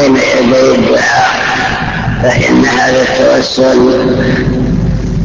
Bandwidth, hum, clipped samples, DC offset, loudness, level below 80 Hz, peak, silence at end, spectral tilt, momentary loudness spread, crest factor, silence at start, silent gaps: 8 kHz; none; under 0.1%; under 0.1%; -9 LUFS; -24 dBFS; 0 dBFS; 0 s; -5.5 dB/octave; 5 LU; 8 dB; 0 s; none